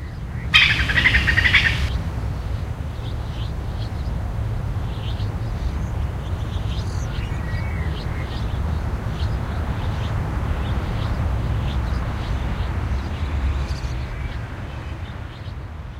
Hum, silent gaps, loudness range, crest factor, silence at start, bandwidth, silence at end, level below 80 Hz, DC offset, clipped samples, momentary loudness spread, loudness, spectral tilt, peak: none; none; 8 LU; 22 dB; 0 s; 14 kHz; 0 s; -28 dBFS; under 0.1%; under 0.1%; 14 LU; -23 LUFS; -5 dB/octave; 0 dBFS